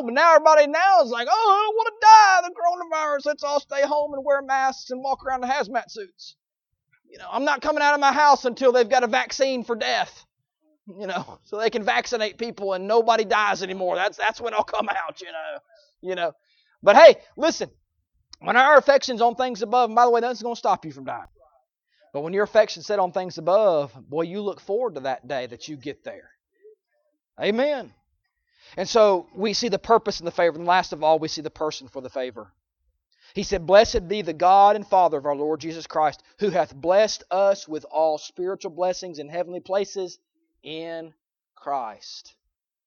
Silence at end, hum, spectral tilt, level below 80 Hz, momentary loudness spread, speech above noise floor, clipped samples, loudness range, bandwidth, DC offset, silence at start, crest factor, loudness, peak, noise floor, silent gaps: 0.65 s; none; -3.5 dB/octave; -56 dBFS; 18 LU; 60 dB; under 0.1%; 11 LU; 7.2 kHz; under 0.1%; 0 s; 22 dB; -21 LUFS; 0 dBFS; -81 dBFS; none